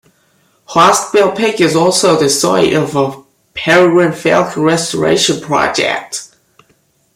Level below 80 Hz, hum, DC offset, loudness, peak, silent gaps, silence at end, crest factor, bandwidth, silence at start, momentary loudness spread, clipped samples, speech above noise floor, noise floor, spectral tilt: -50 dBFS; none; under 0.1%; -11 LUFS; 0 dBFS; none; 0.9 s; 12 dB; 16 kHz; 0.7 s; 9 LU; under 0.1%; 44 dB; -56 dBFS; -3.5 dB/octave